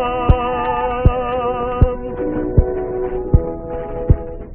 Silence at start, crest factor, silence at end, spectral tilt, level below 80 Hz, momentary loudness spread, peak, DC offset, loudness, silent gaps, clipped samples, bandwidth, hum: 0 s; 16 dB; 0 s; -7.5 dB/octave; -22 dBFS; 7 LU; 0 dBFS; 0.2%; -19 LUFS; none; under 0.1%; 3.4 kHz; none